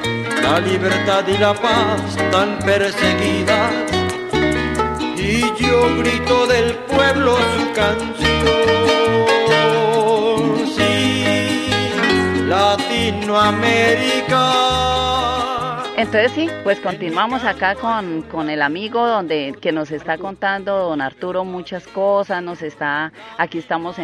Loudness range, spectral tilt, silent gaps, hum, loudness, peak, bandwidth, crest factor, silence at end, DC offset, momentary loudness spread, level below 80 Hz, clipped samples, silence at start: 6 LU; -4.5 dB/octave; none; none; -17 LUFS; -2 dBFS; 13.5 kHz; 16 dB; 0 s; under 0.1%; 8 LU; -40 dBFS; under 0.1%; 0 s